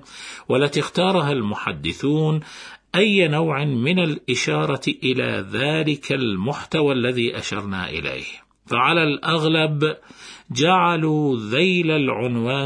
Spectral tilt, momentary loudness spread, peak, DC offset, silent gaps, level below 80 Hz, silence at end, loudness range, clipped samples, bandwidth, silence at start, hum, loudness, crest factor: -5.5 dB/octave; 9 LU; -4 dBFS; under 0.1%; none; -56 dBFS; 0 s; 3 LU; under 0.1%; 10.5 kHz; 0.1 s; none; -20 LUFS; 18 dB